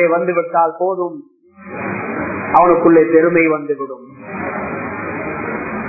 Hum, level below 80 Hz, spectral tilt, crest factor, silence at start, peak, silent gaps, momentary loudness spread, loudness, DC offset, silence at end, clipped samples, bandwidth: none; -50 dBFS; -11.5 dB/octave; 16 dB; 0 s; 0 dBFS; none; 16 LU; -16 LUFS; under 0.1%; 0 s; under 0.1%; 2.7 kHz